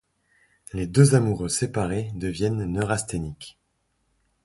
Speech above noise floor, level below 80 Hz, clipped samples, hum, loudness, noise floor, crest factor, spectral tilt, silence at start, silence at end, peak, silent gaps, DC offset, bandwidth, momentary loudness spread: 49 dB; -46 dBFS; under 0.1%; none; -24 LUFS; -72 dBFS; 22 dB; -6 dB/octave; 0.75 s; 0.95 s; -4 dBFS; none; under 0.1%; 11.5 kHz; 18 LU